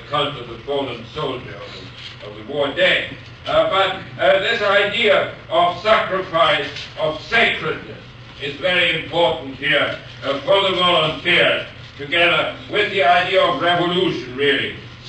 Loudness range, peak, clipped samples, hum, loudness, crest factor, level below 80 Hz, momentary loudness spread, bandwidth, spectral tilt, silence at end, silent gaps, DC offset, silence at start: 4 LU; -4 dBFS; under 0.1%; none; -17 LUFS; 16 dB; -50 dBFS; 16 LU; 9.2 kHz; -4.5 dB/octave; 0 s; none; under 0.1%; 0 s